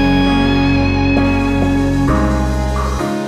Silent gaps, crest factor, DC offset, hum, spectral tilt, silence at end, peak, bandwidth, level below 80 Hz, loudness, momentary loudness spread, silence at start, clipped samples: none; 12 dB; under 0.1%; none; -6.5 dB/octave; 0 s; -2 dBFS; 13 kHz; -20 dBFS; -15 LUFS; 5 LU; 0 s; under 0.1%